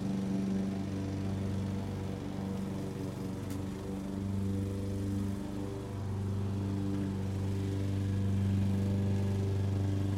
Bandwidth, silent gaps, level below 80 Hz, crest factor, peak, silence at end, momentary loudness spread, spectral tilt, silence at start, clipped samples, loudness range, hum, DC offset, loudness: 13 kHz; none; -52 dBFS; 12 dB; -22 dBFS; 0 s; 7 LU; -8 dB/octave; 0 s; under 0.1%; 4 LU; none; under 0.1%; -35 LUFS